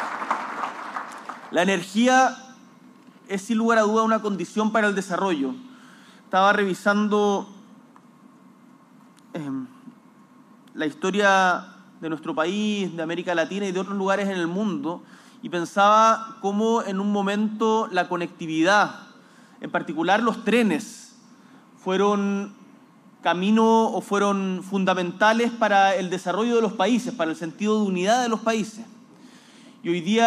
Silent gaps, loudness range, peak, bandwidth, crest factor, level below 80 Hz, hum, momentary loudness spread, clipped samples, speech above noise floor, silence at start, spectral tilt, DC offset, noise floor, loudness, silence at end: none; 4 LU; -6 dBFS; 13 kHz; 16 dB; -78 dBFS; none; 14 LU; under 0.1%; 30 dB; 0 s; -5 dB/octave; under 0.1%; -52 dBFS; -23 LUFS; 0 s